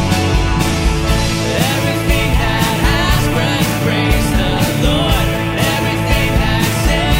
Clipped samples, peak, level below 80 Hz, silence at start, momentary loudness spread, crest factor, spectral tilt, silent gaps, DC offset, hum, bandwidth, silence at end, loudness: under 0.1%; 0 dBFS; -20 dBFS; 0 s; 2 LU; 14 dB; -5 dB/octave; none; under 0.1%; none; 16.5 kHz; 0 s; -14 LUFS